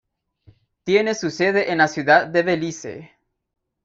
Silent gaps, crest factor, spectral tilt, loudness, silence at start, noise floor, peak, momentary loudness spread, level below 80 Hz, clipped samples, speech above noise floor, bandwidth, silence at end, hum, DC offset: none; 20 dB; -4.5 dB/octave; -19 LUFS; 0.85 s; -55 dBFS; -2 dBFS; 18 LU; -62 dBFS; under 0.1%; 36 dB; 7.8 kHz; 0.8 s; none; under 0.1%